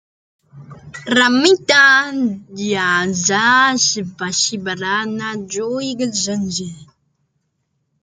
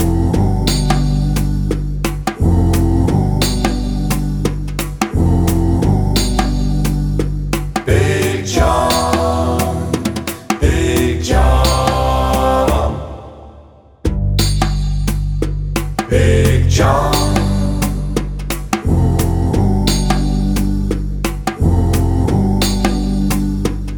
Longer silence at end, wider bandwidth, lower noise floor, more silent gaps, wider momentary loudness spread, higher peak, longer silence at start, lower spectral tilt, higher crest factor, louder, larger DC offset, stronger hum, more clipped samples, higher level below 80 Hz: first, 1.2 s vs 0 s; second, 10 kHz vs over 20 kHz; first, -69 dBFS vs -41 dBFS; neither; first, 13 LU vs 7 LU; about the same, 0 dBFS vs 0 dBFS; first, 0.55 s vs 0 s; second, -2.5 dB/octave vs -6 dB/octave; about the same, 18 dB vs 14 dB; about the same, -15 LUFS vs -16 LUFS; neither; neither; neither; second, -60 dBFS vs -20 dBFS